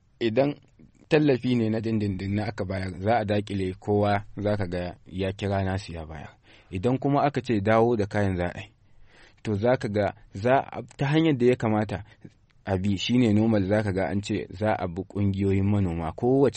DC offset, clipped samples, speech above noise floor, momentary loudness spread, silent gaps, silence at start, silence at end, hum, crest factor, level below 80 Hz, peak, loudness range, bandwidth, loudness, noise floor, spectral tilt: under 0.1%; under 0.1%; 27 dB; 11 LU; none; 0.2 s; 0 s; none; 18 dB; -52 dBFS; -8 dBFS; 3 LU; 8.8 kHz; -26 LUFS; -52 dBFS; -7.5 dB/octave